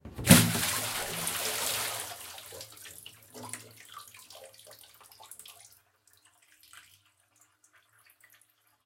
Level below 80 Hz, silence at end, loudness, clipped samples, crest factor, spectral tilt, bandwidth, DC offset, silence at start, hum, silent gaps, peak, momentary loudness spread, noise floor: -58 dBFS; 2.05 s; -26 LUFS; under 0.1%; 34 dB; -3.5 dB/octave; 17 kHz; under 0.1%; 0.05 s; none; none; 0 dBFS; 29 LU; -67 dBFS